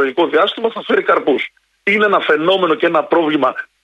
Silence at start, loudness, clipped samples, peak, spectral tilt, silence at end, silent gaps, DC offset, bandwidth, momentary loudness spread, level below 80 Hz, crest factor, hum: 0 s; -15 LUFS; under 0.1%; -2 dBFS; -6 dB/octave; 0.2 s; none; under 0.1%; 9 kHz; 6 LU; -64 dBFS; 14 dB; none